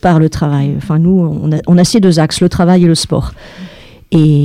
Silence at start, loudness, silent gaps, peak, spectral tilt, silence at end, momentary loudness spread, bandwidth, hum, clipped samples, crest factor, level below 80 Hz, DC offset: 0.05 s; -11 LUFS; none; 0 dBFS; -6.5 dB/octave; 0 s; 10 LU; 13.5 kHz; none; under 0.1%; 10 dB; -32 dBFS; under 0.1%